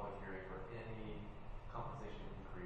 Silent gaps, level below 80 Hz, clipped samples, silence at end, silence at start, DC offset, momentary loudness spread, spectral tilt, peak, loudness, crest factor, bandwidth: none; -54 dBFS; under 0.1%; 0 s; 0 s; under 0.1%; 4 LU; -7.5 dB/octave; -32 dBFS; -51 LUFS; 16 dB; 8.2 kHz